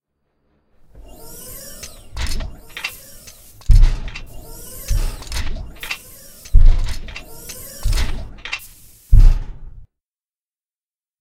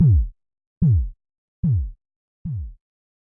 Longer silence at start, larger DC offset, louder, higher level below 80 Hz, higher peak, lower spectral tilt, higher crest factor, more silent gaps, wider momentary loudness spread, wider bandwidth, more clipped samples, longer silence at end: first, 1.25 s vs 0 s; neither; about the same, -23 LUFS vs -23 LUFS; first, -18 dBFS vs -30 dBFS; first, 0 dBFS vs -8 dBFS; second, -4 dB/octave vs -15.5 dB/octave; about the same, 18 dB vs 14 dB; second, none vs 0.67-0.81 s, 1.38-1.63 s, 2.16-2.45 s; first, 22 LU vs 15 LU; first, 15.5 kHz vs 1.2 kHz; neither; first, 1.4 s vs 0.5 s